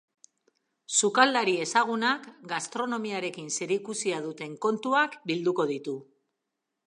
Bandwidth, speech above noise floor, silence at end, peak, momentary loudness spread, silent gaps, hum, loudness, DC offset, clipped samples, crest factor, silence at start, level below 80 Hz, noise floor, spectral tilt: 11.5 kHz; 56 dB; 0.85 s; -4 dBFS; 12 LU; none; none; -27 LUFS; under 0.1%; under 0.1%; 24 dB; 0.9 s; -84 dBFS; -84 dBFS; -2.5 dB/octave